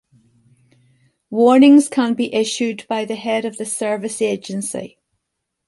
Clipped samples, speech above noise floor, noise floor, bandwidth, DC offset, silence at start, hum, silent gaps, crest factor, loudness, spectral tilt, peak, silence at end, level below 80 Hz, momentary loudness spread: under 0.1%; 61 dB; -77 dBFS; 11.5 kHz; under 0.1%; 1.3 s; none; none; 16 dB; -17 LUFS; -4 dB/octave; -2 dBFS; 0.8 s; -68 dBFS; 14 LU